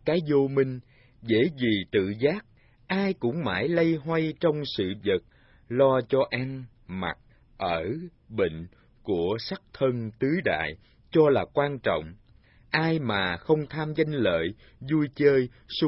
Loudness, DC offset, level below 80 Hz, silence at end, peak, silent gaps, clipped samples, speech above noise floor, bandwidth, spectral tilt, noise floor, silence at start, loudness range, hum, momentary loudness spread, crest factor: -27 LUFS; under 0.1%; -56 dBFS; 0 s; -8 dBFS; none; under 0.1%; 31 dB; 5.8 kHz; -10.5 dB/octave; -57 dBFS; 0.05 s; 4 LU; none; 12 LU; 18 dB